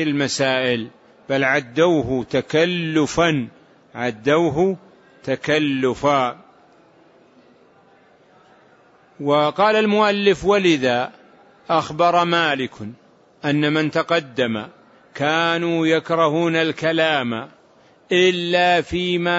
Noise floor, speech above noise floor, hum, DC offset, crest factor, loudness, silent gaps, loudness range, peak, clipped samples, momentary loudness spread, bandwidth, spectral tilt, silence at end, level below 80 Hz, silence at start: -53 dBFS; 34 dB; none; under 0.1%; 16 dB; -19 LUFS; none; 5 LU; -4 dBFS; under 0.1%; 11 LU; 8 kHz; -5 dB/octave; 0 s; -54 dBFS; 0 s